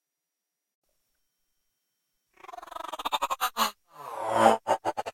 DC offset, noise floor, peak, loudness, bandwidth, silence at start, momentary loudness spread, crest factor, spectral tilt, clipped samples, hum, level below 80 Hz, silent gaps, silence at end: under 0.1%; -86 dBFS; -6 dBFS; -27 LUFS; 16.5 kHz; 2.45 s; 21 LU; 26 dB; -2.5 dB/octave; under 0.1%; none; -68 dBFS; none; 0 s